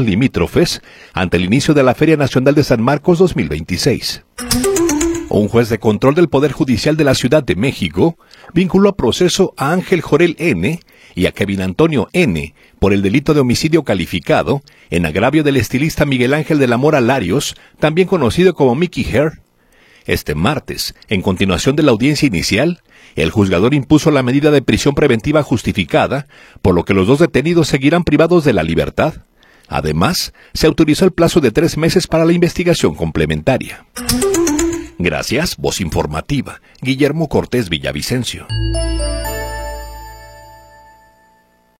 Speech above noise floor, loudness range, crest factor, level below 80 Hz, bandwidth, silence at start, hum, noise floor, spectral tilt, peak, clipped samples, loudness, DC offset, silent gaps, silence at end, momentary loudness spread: 40 dB; 4 LU; 14 dB; -32 dBFS; 16.5 kHz; 0 s; none; -54 dBFS; -5.5 dB/octave; 0 dBFS; under 0.1%; -14 LUFS; under 0.1%; none; 1.35 s; 8 LU